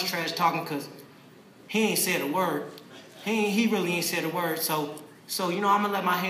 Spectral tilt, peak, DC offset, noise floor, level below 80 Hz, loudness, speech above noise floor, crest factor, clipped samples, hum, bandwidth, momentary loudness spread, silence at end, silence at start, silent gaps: -3.5 dB/octave; -10 dBFS; under 0.1%; -52 dBFS; -84 dBFS; -27 LUFS; 25 dB; 18 dB; under 0.1%; none; 15.5 kHz; 13 LU; 0 s; 0 s; none